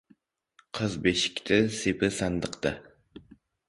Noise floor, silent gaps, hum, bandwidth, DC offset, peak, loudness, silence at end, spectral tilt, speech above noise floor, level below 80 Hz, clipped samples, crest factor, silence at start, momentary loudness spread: -65 dBFS; none; none; 11.5 kHz; under 0.1%; -8 dBFS; -28 LUFS; 0.5 s; -4.5 dB/octave; 38 dB; -52 dBFS; under 0.1%; 22 dB; 0.75 s; 8 LU